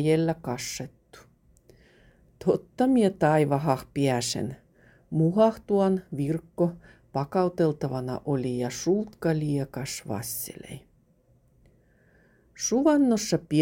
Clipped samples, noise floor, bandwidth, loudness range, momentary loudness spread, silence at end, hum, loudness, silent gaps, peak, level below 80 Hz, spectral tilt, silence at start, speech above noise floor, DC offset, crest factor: under 0.1%; -63 dBFS; 17 kHz; 6 LU; 12 LU; 0 s; none; -26 LUFS; none; -8 dBFS; -58 dBFS; -6 dB/octave; 0 s; 37 dB; under 0.1%; 18 dB